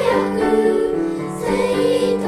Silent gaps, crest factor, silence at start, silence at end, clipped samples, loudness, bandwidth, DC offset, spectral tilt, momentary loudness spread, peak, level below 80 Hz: none; 12 dB; 0 s; 0 s; under 0.1%; -18 LUFS; 14 kHz; under 0.1%; -5.5 dB/octave; 6 LU; -6 dBFS; -44 dBFS